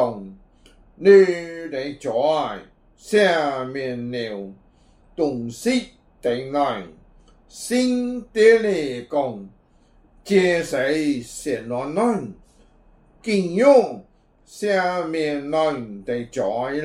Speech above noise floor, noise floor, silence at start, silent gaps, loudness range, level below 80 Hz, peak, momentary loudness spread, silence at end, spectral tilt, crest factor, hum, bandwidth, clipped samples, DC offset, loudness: 35 dB; -55 dBFS; 0 s; none; 6 LU; -56 dBFS; -2 dBFS; 16 LU; 0 s; -5 dB/octave; 20 dB; none; 14.5 kHz; under 0.1%; under 0.1%; -21 LUFS